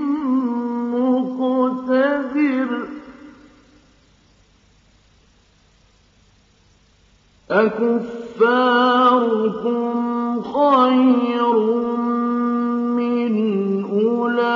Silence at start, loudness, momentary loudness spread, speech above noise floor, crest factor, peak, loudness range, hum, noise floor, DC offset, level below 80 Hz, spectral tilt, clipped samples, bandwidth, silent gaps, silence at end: 0 s; -18 LUFS; 8 LU; 39 dB; 16 dB; -4 dBFS; 9 LU; none; -55 dBFS; under 0.1%; -62 dBFS; -7.5 dB/octave; under 0.1%; 6 kHz; none; 0 s